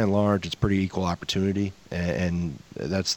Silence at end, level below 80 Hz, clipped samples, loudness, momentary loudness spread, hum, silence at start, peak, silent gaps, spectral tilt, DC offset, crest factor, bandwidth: 0 s; -46 dBFS; under 0.1%; -27 LUFS; 7 LU; none; 0 s; -8 dBFS; none; -5.5 dB/octave; under 0.1%; 18 dB; 17 kHz